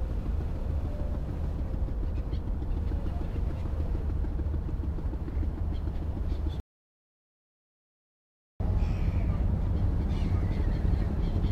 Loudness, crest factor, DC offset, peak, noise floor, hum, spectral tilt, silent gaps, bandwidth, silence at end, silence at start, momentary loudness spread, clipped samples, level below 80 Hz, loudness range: -32 LUFS; 14 dB; under 0.1%; -16 dBFS; under -90 dBFS; none; -9 dB/octave; 6.60-8.60 s; 6 kHz; 0 s; 0 s; 5 LU; under 0.1%; -32 dBFS; 6 LU